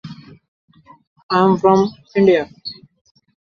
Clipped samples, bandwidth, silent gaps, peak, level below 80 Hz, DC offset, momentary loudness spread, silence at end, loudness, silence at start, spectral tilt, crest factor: under 0.1%; 7 kHz; 0.48-0.68 s, 1.07-1.16 s, 1.23-1.29 s; -2 dBFS; -58 dBFS; under 0.1%; 18 LU; 0.7 s; -15 LUFS; 0.05 s; -7 dB/octave; 18 dB